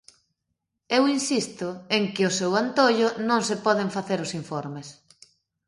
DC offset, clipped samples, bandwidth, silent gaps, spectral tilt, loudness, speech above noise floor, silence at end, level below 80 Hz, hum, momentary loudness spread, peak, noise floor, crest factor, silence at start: under 0.1%; under 0.1%; 11.5 kHz; none; -4 dB/octave; -24 LUFS; 56 dB; 0.75 s; -70 dBFS; none; 12 LU; -6 dBFS; -80 dBFS; 20 dB; 0.9 s